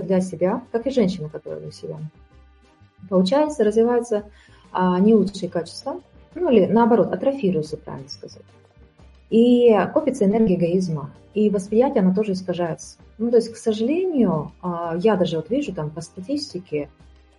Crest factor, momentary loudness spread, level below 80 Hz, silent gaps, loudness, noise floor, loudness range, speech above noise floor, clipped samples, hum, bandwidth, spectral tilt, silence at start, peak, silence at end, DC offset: 18 dB; 17 LU; -54 dBFS; none; -21 LUFS; -53 dBFS; 4 LU; 33 dB; under 0.1%; none; 11.5 kHz; -7 dB/octave; 0 s; -4 dBFS; 0.55 s; under 0.1%